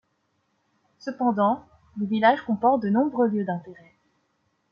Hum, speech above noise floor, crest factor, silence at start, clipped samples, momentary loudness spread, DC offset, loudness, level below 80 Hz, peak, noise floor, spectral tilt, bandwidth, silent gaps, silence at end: none; 49 dB; 20 dB; 1.05 s; under 0.1%; 14 LU; under 0.1%; -24 LUFS; -68 dBFS; -6 dBFS; -72 dBFS; -8 dB/octave; 6.6 kHz; none; 1 s